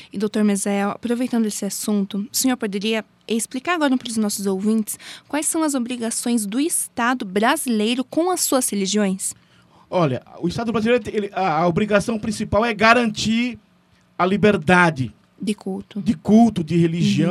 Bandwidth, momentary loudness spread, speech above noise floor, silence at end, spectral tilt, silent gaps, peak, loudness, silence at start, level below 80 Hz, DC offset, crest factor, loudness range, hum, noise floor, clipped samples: 15.5 kHz; 10 LU; 37 dB; 0 s; -4.5 dB/octave; none; 0 dBFS; -20 LUFS; 0 s; -52 dBFS; under 0.1%; 20 dB; 3 LU; none; -57 dBFS; under 0.1%